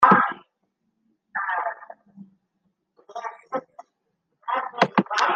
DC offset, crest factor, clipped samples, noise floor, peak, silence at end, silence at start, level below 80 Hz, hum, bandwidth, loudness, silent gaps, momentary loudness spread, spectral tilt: under 0.1%; 24 dB; under 0.1%; -76 dBFS; -2 dBFS; 0 s; 0 s; -70 dBFS; none; 9.4 kHz; -25 LUFS; none; 20 LU; -5 dB/octave